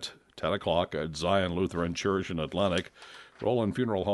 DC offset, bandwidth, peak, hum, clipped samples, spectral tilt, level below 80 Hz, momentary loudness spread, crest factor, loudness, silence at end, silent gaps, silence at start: under 0.1%; 11.5 kHz; -12 dBFS; none; under 0.1%; -5.5 dB/octave; -54 dBFS; 9 LU; 18 dB; -30 LUFS; 0 s; none; 0 s